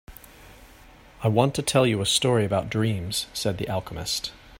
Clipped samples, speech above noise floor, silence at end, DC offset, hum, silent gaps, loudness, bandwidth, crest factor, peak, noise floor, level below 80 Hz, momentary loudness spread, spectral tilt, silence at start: under 0.1%; 26 dB; 0 s; under 0.1%; none; none; -24 LUFS; 16.5 kHz; 20 dB; -4 dBFS; -50 dBFS; -50 dBFS; 8 LU; -4.5 dB/octave; 0.1 s